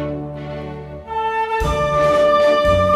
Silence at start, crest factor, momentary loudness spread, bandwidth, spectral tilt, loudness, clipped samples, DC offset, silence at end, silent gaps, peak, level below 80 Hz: 0 s; 14 dB; 16 LU; 13.5 kHz; -6 dB/octave; -17 LUFS; under 0.1%; under 0.1%; 0 s; none; -4 dBFS; -32 dBFS